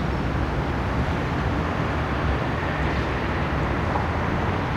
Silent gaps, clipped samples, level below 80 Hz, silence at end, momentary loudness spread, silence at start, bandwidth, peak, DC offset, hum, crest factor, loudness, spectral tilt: none; under 0.1%; -30 dBFS; 0 s; 1 LU; 0 s; 11 kHz; -10 dBFS; under 0.1%; none; 12 dB; -25 LUFS; -7 dB/octave